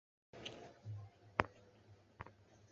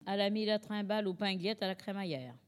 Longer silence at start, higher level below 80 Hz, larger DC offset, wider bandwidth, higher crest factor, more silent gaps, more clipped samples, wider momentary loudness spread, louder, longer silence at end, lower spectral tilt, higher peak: first, 0.35 s vs 0 s; first, -66 dBFS vs -84 dBFS; neither; second, 7.6 kHz vs 12.5 kHz; first, 40 dB vs 16 dB; neither; neither; first, 25 LU vs 7 LU; second, -47 LUFS vs -36 LUFS; about the same, 0.05 s vs 0.1 s; second, -3.5 dB/octave vs -6 dB/octave; first, -10 dBFS vs -18 dBFS